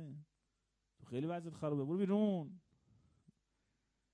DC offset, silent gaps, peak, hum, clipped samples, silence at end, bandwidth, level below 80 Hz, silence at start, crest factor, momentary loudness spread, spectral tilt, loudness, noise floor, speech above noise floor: under 0.1%; none; -24 dBFS; none; under 0.1%; 1.55 s; 10 kHz; -82 dBFS; 0 s; 18 dB; 18 LU; -9 dB/octave; -39 LUFS; -85 dBFS; 47 dB